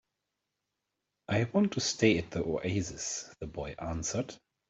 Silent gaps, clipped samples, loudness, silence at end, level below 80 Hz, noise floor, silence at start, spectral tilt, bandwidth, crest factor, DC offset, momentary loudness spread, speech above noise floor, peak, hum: none; under 0.1%; -32 LUFS; 0.35 s; -56 dBFS; -86 dBFS; 1.3 s; -4.5 dB/octave; 8.2 kHz; 22 dB; under 0.1%; 13 LU; 54 dB; -10 dBFS; 50 Hz at -50 dBFS